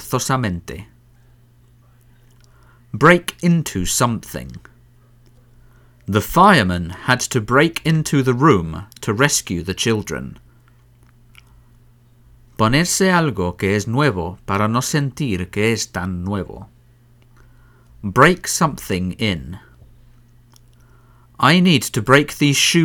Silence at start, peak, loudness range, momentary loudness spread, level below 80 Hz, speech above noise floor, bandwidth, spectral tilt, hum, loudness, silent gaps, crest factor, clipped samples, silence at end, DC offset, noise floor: 0 s; 0 dBFS; 6 LU; 16 LU; -42 dBFS; 34 dB; 19.5 kHz; -4.5 dB/octave; none; -17 LUFS; none; 20 dB; under 0.1%; 0 s; under 0.1%; -51 dBFS